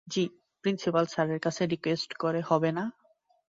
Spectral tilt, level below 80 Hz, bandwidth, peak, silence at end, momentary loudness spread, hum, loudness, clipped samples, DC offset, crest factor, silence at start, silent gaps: -5.5 dB/octave; -72 dBFS; 7.8 kHz; -10 dBFS; 0.65 s; 7 LU; none; -30 LUFS; under 0.1%; under 0.1%; 20 dB; 0.05 s; none